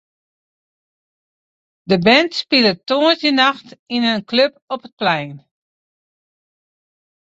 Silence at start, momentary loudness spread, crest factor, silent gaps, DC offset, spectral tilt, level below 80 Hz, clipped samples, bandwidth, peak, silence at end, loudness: 1.9 s; 14 LU; 20 dB; 3.79-3.86 s, 4.62-4.68 s, 4.92-4.97 s; under 0.1%; -5 dB/octave; -62 dBFS; under 0.1%; 8 kHz; 0 dBFS; 2 s; -16 LUFS